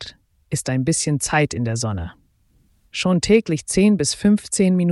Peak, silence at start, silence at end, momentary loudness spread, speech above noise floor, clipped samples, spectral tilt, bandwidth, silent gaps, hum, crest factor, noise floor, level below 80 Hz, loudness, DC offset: -4 dBFS; 0 s; 0 s; 12 LU; 41 dB; under 0.1%; -5 dB/octave; 12 kHz; none; none; 16 dB; -59 dBFS; -44 dBFS; -19 LUFS; under 0.1%